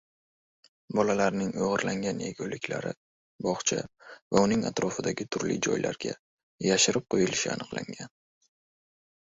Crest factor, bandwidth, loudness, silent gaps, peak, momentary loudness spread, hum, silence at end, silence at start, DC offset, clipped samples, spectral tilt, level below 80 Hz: 22 dB; 8.4 kHz; -29 LUFS; 2.97-3.39 s, 4.22-4.31 s, 6.19-6.58 s; -8 dBFS; 13 LU; none; 1.2 s; 0.9 s; under 0.1%; under 0.1%; -3.5 dB/octave; -62 dBFS